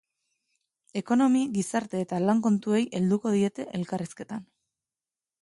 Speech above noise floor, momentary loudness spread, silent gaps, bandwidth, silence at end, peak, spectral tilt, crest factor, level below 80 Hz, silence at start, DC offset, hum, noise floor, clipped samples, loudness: over 64 dB; 13 LU; none; 11.5 kHz; 1 s; -10 dBFS; -6.5 dB/octave; 18 dB; -72 dBFS; 0.95 s; under 0.1%; none; under -90 dBFS; under 0.1%; -27 LUFS